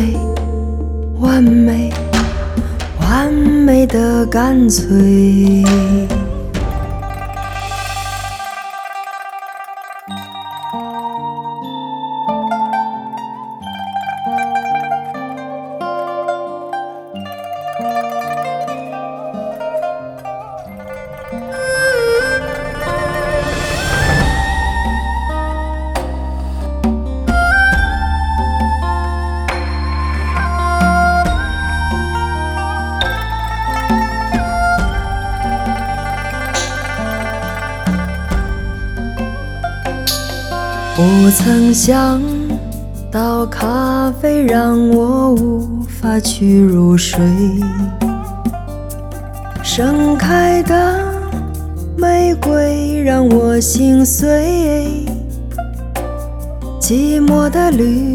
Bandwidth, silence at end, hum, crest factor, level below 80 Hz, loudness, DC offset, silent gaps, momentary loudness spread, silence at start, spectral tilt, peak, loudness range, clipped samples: 18 kHz; 0 s; none; 14 dB; -24 dBFS; -15 LUFS; under 0.1%; none; 15 LU; 0 s; -5.5 dB/octave; 0 dBFS; 10 LU; under 0.1%